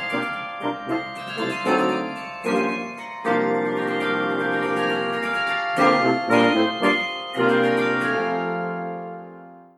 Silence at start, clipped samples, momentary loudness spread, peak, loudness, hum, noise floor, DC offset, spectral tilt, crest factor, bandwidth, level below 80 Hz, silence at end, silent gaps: 0 s; under 0.1%; 11 LU; -4 dBFS; -22 LUFS; none; -43 dBFS; under 0.1%; -5.5 dB/octave; 20 dB; 13 kHz; -68 dBFS; 0.15 s; none